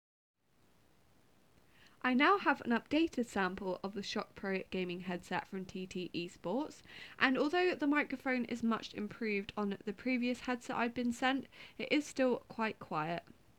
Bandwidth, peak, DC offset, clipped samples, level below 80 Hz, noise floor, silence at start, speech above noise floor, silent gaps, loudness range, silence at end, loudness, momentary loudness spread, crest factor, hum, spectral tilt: 13.5 kHz; -12 dBFS; under 0.1%; under 0.1%; -70 dBFS; -71 dBFS; 2.05 s; 35 dB; none; 5 LU; 0.35 s; -36 LUFS; 10 LU; 24 dB; none; -5 dB/octave